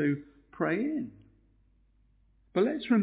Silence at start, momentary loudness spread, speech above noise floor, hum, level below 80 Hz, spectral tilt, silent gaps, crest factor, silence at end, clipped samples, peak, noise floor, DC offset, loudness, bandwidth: 0 s; 9 LU; 37 dB; none; -66 dBFS; -6 dB/octave; none; 16 dB; 0 s; under 0.1%; -14 dBFS; -66 dBFS; under 0.1%; -31 LUFS; 4 kHz